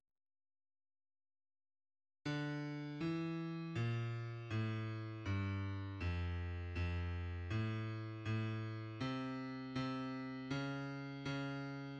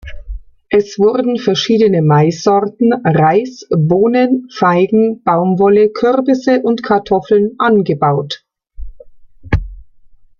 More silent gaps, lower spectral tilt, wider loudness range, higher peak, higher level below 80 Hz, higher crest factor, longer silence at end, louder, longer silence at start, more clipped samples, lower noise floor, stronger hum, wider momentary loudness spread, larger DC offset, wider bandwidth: neither; about the same, -7.5 dB/octave vs -7 dB/octave; about the same, 2 LU vs 3 LU; second, -28 dBFS vs 0 dBFS; second, -60 dBFS vs -34 dBFS; about the same, 14 dB vs 12 dB; second, 0 s vs 0.6 s; second, -43 LUFS vs -13 LUFS; first, 2.25 s vs 0.05 s; neither; first, under -90 dBFS vs -42 dBFS; neither; second, 5 LU vs 8 LU; neither; first, 8 kHz vs 7.2 kHz